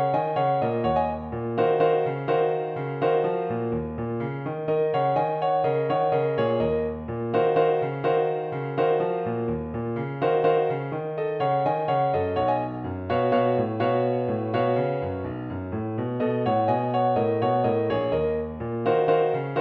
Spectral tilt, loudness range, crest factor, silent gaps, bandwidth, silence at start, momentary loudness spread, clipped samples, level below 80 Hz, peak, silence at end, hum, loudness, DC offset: -9.5 dB/octave; 2 LU; 14 dB; none; 4.9 kHz; 0 s; 8 LU; under 0.1%; -52 dBFS; -10 dBFS; 0 s; none; -25 LUFS; under 0.1%